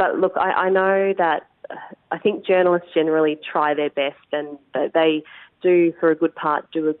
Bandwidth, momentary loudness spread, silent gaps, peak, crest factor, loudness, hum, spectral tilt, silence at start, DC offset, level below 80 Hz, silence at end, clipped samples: 4.1 kHz; 10 LU; none; -6 dBFS; 14 dB; -20 LUFS; none; -10 dB/octave; 0 s; under 0.1%; -70 dBFS; 0.05 s; under 0.1%